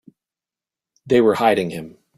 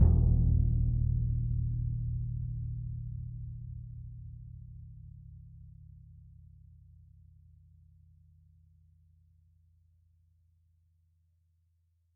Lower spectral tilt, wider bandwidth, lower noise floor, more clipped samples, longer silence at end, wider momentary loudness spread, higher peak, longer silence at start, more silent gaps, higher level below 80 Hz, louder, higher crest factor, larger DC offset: second, -6 dB/octave vs -15 dB/octave; first, 15.5 kHz vs 1.2 kHz; first, -90 dBFS vs -72 dBFS; neither; second, 0.3 s vs 5.9 s; second, 13 LU vs 26 LU; first, -2 dBFS vs -12 dBFS; first, 1.05 s vs 0 s; neither; second, -58 dBFS vs -38 dBFS; first, -18 LUFS vs -33 LUFS; about the same, 18 dB vs 22 dB; neither